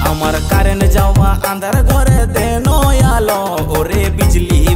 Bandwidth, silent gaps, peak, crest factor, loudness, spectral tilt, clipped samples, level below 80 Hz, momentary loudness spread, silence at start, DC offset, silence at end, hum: 16.5 kHz; none; -2 dBFS; 10 dB; -13 LUFS; -5.5 dB/octave; under 0.1%; -14 dBFS; 4 LU; 0 s; under 0.1%; 0 s; none